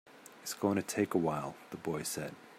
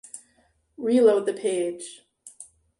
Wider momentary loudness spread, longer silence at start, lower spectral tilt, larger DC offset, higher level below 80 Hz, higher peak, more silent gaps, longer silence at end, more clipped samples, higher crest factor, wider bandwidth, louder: second, 12 LU vs 25 LU; about the same, 0.05 s vs 0.15 s; about the same, -5 dB/octave vs -4.5 dB/octave; neither; about the same, -72 dBFS vs -72 dBFS; second, -18 dBFS vs -8 dBFS; neither; second, 0 s vs 0.35 s; neither; about the same, 18 dB vs 18 dB; first, 16 kHz vs 11.5 kHz; second, -36 LUFS vs -23 LUFS